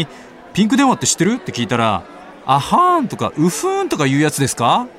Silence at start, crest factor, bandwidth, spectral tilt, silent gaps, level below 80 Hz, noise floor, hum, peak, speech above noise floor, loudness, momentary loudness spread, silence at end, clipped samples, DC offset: 0 s; 16 dB; 16.5 kHz; -4.5 dB/octave; none; -52 dBFS; -37 dBFS; none; -2 dBFS; 22 dB; -16 LUFS; 8 LU; 0.05 s; under 0.1%; under 0.1%